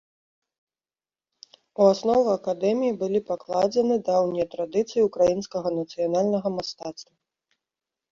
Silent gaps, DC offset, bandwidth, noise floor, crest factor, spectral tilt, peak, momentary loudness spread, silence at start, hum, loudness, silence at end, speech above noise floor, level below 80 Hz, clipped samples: none; under 0.1%; 7.6 kHz; under -90 dBFS; 20 dB; -6 dB/octave; -6 dBFS; 9 LU; 1.8 s; none; -24 LUFS; 1.1 s; over 67 dB; -64 dBFS; under 0.1%